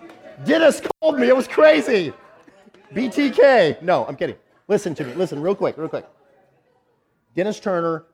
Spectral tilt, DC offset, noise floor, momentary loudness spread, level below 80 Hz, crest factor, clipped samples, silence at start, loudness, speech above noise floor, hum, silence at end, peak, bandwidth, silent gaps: -5 dB/octave; under 0.1%; -65 dBFS; 15 LU; -64 dBFS; 18 dB; under 0.1%; 0 s; -19 LUFS; 47 dB; none; 0.15 s; -2 dBFS; 14 kHz; none